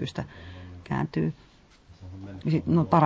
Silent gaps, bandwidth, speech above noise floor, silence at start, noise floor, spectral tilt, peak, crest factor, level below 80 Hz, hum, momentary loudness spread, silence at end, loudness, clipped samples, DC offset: none; 7.6 kHz; 29 dB; 0 s; -54 dBFS; -8.5 dB/octave; -8 dBFS; 20 dB; -50 dBFS; none; 21 LU; 0 s; -28 LUFS; under 0.1%; under 0.1%